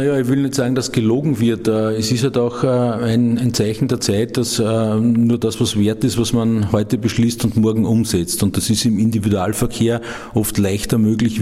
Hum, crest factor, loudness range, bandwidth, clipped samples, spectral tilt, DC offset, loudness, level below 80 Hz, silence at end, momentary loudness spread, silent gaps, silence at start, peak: none; 14 dB; 1 LU; 15.5 kHz; under 0.1%; -5.5 dB/octave; under 0.1%; -17 LUFS; -42 dBFS; 0 s; 3 LU; none; 0 s; -2 dBFS